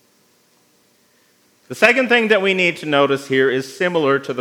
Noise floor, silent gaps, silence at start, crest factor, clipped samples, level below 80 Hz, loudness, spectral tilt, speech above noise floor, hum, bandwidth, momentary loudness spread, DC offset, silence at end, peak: -58 dBFS; none; 1.7 s; 18 dB; under 0.1%; -78 dBFS; -16 LUFS; -4.5 dB/octave; 41 dB; none; 16.5 kHz; 6 LU; under 0.1%; 0 s; 0 dBFS